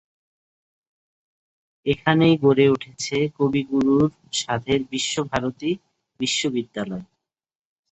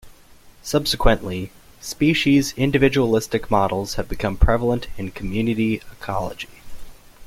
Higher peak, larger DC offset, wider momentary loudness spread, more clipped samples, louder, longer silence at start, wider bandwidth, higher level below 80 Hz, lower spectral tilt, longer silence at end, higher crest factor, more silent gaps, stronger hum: about the same, -4 dBFS vs -2 dBFS; neither; second, 12 LU vs 15 LU; neither; about the same, -22 LUFS vs -21 LUFS; first, 1.85 s vs 0.05 s; second, 8.4 kHz vs 16 kHz; second, -56 dBFS vs -30 dBFS; about the same, -5 dB/octave vs -5.5 dB/octave; first, 0.9 s vs 0 s; about the same, 20 dB vs 20 dB; neither; neither